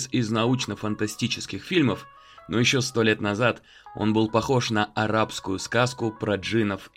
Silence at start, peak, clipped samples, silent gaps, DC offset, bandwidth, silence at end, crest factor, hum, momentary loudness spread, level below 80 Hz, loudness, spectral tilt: 0 s; -6 dBFS; under 0.1%; none; under 0.1%; 16 kHz; 0.1 s; 18 dB; none; 7 LU; -56 dBFS; -24 LUFS; -5 dB/octave